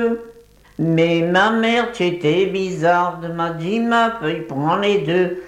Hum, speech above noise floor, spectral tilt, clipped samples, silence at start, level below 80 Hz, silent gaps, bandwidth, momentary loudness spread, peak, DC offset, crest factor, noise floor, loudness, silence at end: none; 28 dB; -6 dB/octave; under 0.1%; 0 s; -54 dBFS; none; 11.5 kHz; 8 LU; -4 dBFS; under 0.1%; 14 dB; -46 dBFS; -18 LUFS; 0 s